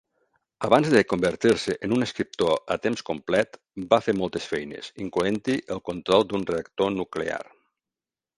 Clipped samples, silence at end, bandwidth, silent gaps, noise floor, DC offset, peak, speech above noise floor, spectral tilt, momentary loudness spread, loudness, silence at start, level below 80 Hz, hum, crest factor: under 0.1%; 0.95 s; 11.5 kHz; none; under -90 dBFS; under 0.1%; -2 dBFS; over 66 dB; -5.5 dB/octave; 10 LU; -25 LUFS; 0.6 s; -58 dBFS; none; 22 dB